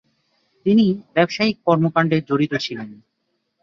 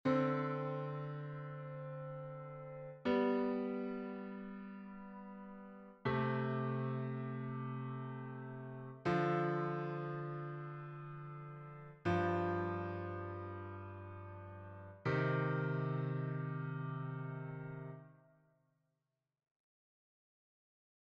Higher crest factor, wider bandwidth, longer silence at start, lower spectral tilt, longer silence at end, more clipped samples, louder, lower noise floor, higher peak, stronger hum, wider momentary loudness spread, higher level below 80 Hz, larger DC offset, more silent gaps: about the same, 18 dB vs 18 dB; first, 7.2 kHz vs 6.4 kHz; first, 0.65 s vs 0.05 s; about the same, -7 dB/octave vs -7 dB/octave; second, 0.7 s vs 2.85 s; neither; first, -19 LUFS vs -41 LUFS; second, -73 dBFS vs -88 dBFS; first, -2 dBFS vs -22 dBFS; neither; second, 10 LU vs 16 LU; first, -60 dBFS vs -74 dBFS; neither; neither